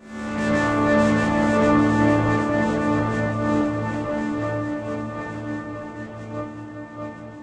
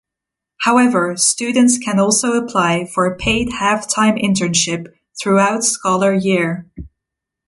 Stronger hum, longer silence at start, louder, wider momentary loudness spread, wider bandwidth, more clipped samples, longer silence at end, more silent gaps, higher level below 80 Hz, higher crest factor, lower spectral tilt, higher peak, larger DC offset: neither; second, 0 s vs 0.6 s; second, -22 LUFS vs -15 LUFS; first, 16 LU vs 6 LU; second, 9.8 kHz vs 11.5 kHz; neither; second, 0 s vs 0.6 s; neither; about the same, -44 dBFS vs -44 dBFS; about the same, 16 dB vs 16 dB; first, -7 dB/octave vs -3.5 dB/octave; second, -6 dBFS vs 0 dBFS; neither